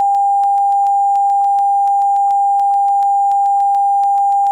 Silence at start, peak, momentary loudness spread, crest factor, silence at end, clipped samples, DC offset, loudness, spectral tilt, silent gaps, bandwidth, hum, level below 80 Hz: 0 s; -8 dBFS; 0 LU; 4 dB; 0 s; under 0.1%; under 0.1%; -13 LUFS; -0.5 dB/octave; none; 9.4 kHz; none; -72 dBFS